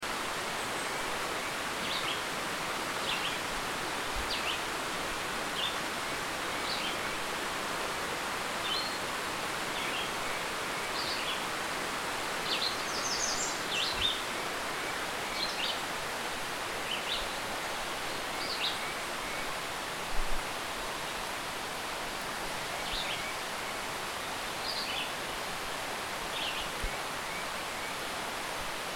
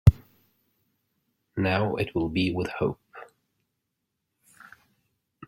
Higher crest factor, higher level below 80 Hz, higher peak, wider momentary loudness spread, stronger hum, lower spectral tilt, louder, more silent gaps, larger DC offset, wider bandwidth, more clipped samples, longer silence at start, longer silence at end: second, 18 dB vs 26 dB; second, -50 dBFS vs -40 dBFS; second, -16 dBFS vs -2 dBFS; second, 4 LU vs 21 LU; neither; second, -1.5 dB/octave vs -8 dB/octave; second, -33 LUFS vs -27 LUFS; neither; neither; first, 18 kHz vs 14 kHz; neither; about the same, 0 s vs 0.05 s; second, 0 s vs 2.25 s